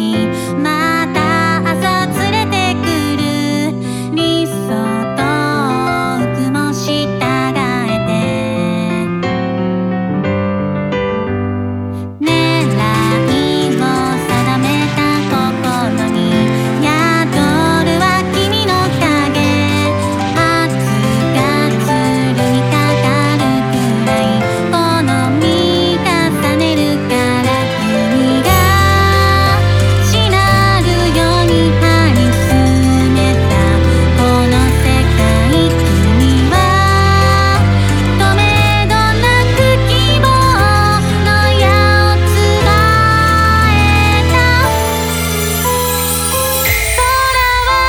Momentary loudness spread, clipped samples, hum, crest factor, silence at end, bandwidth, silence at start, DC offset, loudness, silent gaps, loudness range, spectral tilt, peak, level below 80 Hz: 6 LU; under 0.1%; none; 12 dB; 0 s; over 20 kHz; 0 s; under 0.1%; -12 LUFS; none; 5 LU; -5 dB/octave; 0 dBFS; -24 dBFS